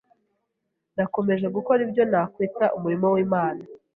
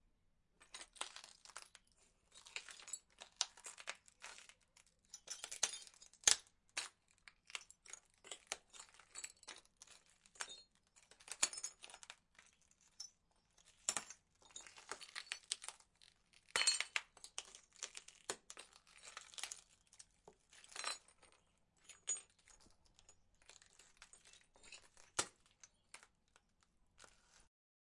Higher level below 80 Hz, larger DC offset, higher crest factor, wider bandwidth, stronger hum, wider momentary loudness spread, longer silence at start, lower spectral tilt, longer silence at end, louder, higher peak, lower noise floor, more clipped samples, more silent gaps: first, -66 dBFS vs -80 dBFS; neither; second, 16 dB vs 40 dB; second, 4 kHz vs 12 kHz; neither; second, 7 LU vs 24 LU; first, 0.95 s vs 0.6 s; first, -11 dB/octave vs 2 dB/octave; second, 0.2 s vs 0.9 s; first, -23 LUFS vs -44 LUFS; about the same, -8 dBFS vs -10 dBFS; about the same, -79 dBFS vs -78 dBFS; neither; neither